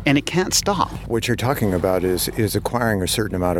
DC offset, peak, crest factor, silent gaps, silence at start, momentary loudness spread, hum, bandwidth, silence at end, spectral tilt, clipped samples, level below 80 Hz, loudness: under 0.1%; -2 dBFS; 18 dB; none; 0 s; 4 LU; none; 19 kHz; 0 s; -4.5 dB/octave; under 0.1%; -38 dBFS; -20 LUFS